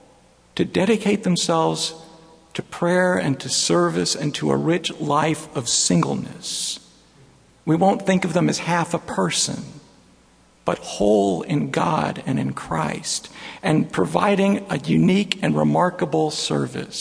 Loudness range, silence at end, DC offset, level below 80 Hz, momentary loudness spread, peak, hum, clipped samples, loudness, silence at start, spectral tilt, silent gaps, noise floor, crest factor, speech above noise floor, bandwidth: 3 LU; 0 s; under 0.1%; -54 dBFS; 9 LU; 0 dBFS; none; under 0.1%; -21 LUFS; 0.55 s; -4.5 dB/octave; none; -55 dBFS; 20 dB; 34 dB; 11 kHz